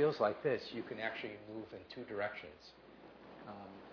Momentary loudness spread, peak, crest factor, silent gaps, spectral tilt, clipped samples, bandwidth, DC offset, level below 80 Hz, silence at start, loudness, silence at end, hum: 22 LU; -20 dBFS; 20 dB; none; -3.5 dB/octave; under 0.1%; 5.4 kHz; under 0.1%; -76 dBFS; 0 s; -41 LUFS; 0 s; none